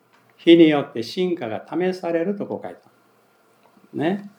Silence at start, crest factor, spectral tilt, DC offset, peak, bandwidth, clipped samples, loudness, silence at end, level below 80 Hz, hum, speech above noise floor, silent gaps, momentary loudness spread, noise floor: 0.45 s; 20 dB; -7 dB/octave; under 0.1%; -2 dBFS; 9 kHz; under 0.1%; -20 LUFS; 0.1 s; -84 dBFS; none; 39 dB; none; 17 LU; -59 dBFS